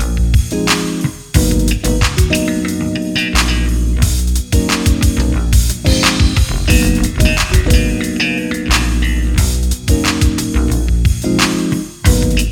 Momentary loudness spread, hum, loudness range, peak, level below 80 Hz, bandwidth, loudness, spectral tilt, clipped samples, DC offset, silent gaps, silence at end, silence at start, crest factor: 5 LU; none; 2 LU; 0 dBFS; -16 dBFS; 17.5 kHz; -14 LUFS; -4.5 dB/octave; under 0.1%; under 0.1%; none; 0 s; 0 s; 12 dB